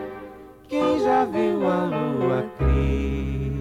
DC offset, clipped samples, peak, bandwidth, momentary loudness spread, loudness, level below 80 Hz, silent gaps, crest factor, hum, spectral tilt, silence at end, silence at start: under 0.1%; under 0.1%; -10 dBFS; 10 kHz; 9 LU; -23 LUFS; -30 dBFS; none; 12 dB; none; -8 dB/octave; 0 s; 0 s